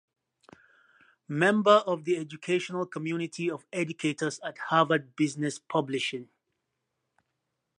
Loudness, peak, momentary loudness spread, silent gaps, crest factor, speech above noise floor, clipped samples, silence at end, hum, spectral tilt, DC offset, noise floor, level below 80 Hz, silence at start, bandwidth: -28 LUFS; -8 dBFS; 11 LU; none; 22 dB; 54 dB; under 0.1%; 1.55 s; none; -5 dB/octave; under 0.1%; -82 dBFS; -80 dBFS; 1.3 s; 11 kHz